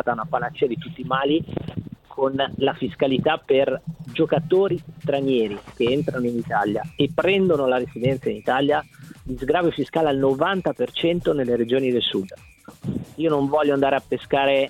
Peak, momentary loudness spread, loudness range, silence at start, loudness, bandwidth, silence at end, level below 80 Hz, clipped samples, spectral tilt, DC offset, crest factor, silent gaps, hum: -4 dBFS; 11 LU; 1 LU; 0.05 s; -22 LUFS; 13.5 kHz; 0 s; -50 dBFS; under 0.1%; -7 dB/octave; under 0.1%; 18 dB; none; none